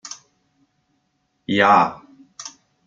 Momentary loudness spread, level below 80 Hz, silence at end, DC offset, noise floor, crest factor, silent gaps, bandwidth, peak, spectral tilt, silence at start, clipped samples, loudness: 23 LU; -66 dBFS; 0.4 s; under 0.1%; -69 dBFS; 22 dB; none; 7.8 kHz; -2 dBFS; -4 dB/octave; 0.05 s; under 0.1%; -17 LUFS